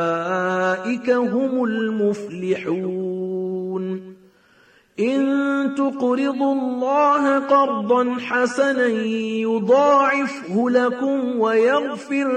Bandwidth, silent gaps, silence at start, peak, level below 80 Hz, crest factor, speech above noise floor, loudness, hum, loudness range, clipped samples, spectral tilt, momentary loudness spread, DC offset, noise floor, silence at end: 9.6 kHz; none; 0 s; -6 dBFS; -70 dBFS; 14 dB; 36 dB; -20 LUFS; none; 6 LU; under 0.1%; -6 dB/octave; 9 LU; under 0.1%; -55 dBFS; 0 s